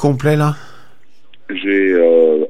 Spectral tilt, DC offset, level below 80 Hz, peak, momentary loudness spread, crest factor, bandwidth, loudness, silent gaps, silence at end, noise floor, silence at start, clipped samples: -7.5 dB/octave; 2%; -54 dBFS; -2 dBFS; 14 LU; 14 dB; 14 kHz; -14 LUFS; none; 0 s; -53 dBFS; 0 s; under 0.1%